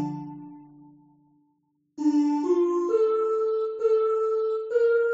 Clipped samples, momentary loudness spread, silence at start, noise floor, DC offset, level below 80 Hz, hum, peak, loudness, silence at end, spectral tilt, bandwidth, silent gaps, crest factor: under 0.1%; 12 LU; 0 s; -71 dBFS; under 0.1%; -78 dBFS; none; -12 dBFS; -24 LUFS; 0 s; -7 dB/octave; 7.8 kHz; none; 12 dB